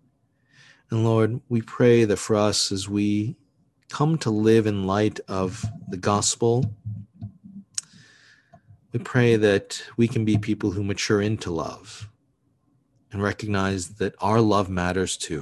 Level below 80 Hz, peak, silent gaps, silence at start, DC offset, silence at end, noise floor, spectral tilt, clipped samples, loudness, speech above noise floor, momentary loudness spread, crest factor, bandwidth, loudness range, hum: -48 dBFS; -6 dBFS; none; 0.9 s; under 0.1%; 0 s; -67 dBFS; -5.5 dB/octave; under 0.1%; -23 LUFS; 45 dB; 14 LU; 18 dB; 12.5 kHz; 5 LU; none